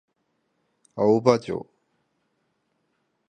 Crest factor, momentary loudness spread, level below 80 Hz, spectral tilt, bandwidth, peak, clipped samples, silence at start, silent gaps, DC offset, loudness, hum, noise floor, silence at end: 26 dB; 15 LU; -66 dBFS; -7 dB/octave; 9.6 kHz; -2 dBFS; under 0.1%; 0.95 s; none; under 0.1%; -22 LUFS; none; -73 dBFS; 1.65 s